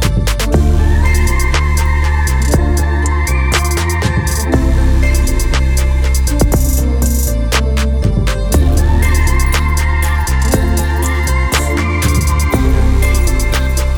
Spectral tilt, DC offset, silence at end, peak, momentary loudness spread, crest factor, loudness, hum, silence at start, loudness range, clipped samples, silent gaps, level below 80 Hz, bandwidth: -5 dB/octave; under 0.1%; 0 s; 0 dBFS; 2 LU; 10 dB; -14 LUFS; none; 0 s; 1 LU; under 0.1%; none; -12 dBFS; 19 kHz